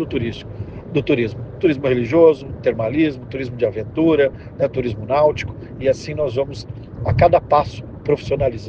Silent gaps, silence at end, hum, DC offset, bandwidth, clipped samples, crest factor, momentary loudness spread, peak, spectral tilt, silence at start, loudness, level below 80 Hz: none; 0 s; none; under 0.1%; 8 kHz; under 0.1%; 18 dB; 13 LU; 0 dBFS; -7.5 dB/octave; 0 s; -19 LUFS; -40 dBFS